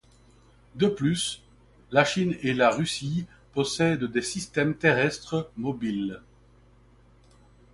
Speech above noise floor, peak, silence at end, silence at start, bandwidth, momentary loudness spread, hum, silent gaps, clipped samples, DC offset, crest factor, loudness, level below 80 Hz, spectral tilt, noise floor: 31 dB; -6 dBFS; 1.55 s; 0.75 s; 11.5 kHz; 10 LU; none; none; under 0.1%; under 0.1%; 22 dB; -26 LUFS; -58 dBFS; -5 dB/octave; -57 dBFS